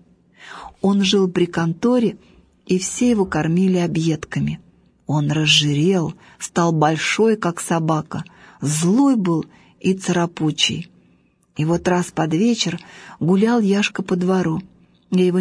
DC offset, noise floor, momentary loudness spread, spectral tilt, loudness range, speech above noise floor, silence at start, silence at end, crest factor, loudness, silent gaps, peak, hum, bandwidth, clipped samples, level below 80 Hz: under 0.1%; -58 dBFS; 15 LU; -5 dB/octave; 2 LU; 40 dB; 0.4 s; 0 s; 16 dB; -19 LUFS; none; -2 dBFS; none; 11 kHz; under 0.1%; -52 dBFS